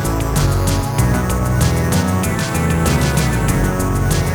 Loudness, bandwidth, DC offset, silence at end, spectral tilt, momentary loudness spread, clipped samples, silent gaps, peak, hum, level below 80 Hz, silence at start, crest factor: -17 LUFS; over 20 kHz; under 0.1%; 0 s; -5.5 dB/octave; 2 LU; under 0.1%; none; -2 dBFS; none; -24 dBFS; 0 s; 14 dB